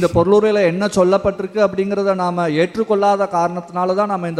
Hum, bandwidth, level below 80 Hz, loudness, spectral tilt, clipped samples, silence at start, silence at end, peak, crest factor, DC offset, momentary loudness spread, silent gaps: none; 12 kHz; -46 dBFS; -17 LUFS; -6.5 dB/octave; under 0.1%; 0 s; 0 s; -2 dBFS; 14 dB; under 0.1%; 6 LU; none